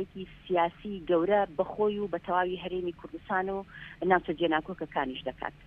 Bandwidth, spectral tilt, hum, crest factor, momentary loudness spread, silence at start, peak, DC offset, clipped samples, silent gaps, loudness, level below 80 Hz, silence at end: 4.6 kHz; -8 dB/octave; none; 22 dB; 11 LU; 0 s; -8 dBFS; under 0.1%; under 0.1%; none; -30 LUFS; -58 dBFS; 0 s